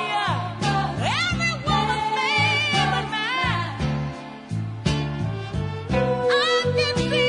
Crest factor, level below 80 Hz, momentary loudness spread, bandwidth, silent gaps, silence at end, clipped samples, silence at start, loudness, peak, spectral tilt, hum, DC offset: 16 dB; -42 dBFS; 10 LU; 11 kHz; none; 0 s; under 0.1%; 0 s; -23 LUFS; -8 dBFS; -5 dB/octave; none; under 0.1%